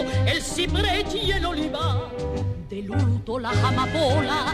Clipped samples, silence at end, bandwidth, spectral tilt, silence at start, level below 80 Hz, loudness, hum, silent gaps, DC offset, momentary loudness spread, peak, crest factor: under 0.1%; 0 s; 14 kHz; -5 dB/octave; 0 s; -34 dBFS; -24 LUFS; none; none; under 0.1%; 7 LU; -10 dBFS; 14 dB